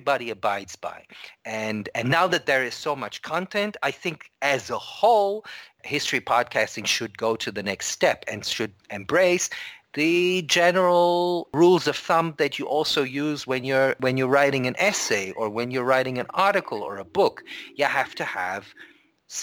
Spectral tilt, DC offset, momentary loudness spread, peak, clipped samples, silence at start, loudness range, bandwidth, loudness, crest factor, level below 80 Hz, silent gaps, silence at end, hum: -3.5 dB/octave; under 0.1%; 12 LU; -8 dBFS; under 0.1%; 0 s; 5 LU; 18.5 kHz; -23 LUFS; 16 dB; -66 dBFS; none; 0 s; none